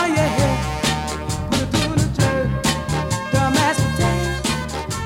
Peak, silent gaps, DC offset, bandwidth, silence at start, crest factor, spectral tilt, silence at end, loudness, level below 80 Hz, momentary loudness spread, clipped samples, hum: -4 dBFS; none; under 0.1%; 18.5 kHz; 0 s; 16 dB; -4.5 dB/octave; 0 s; -20 LUFS; -32 dBFS; 6 LU; under 0.1%; none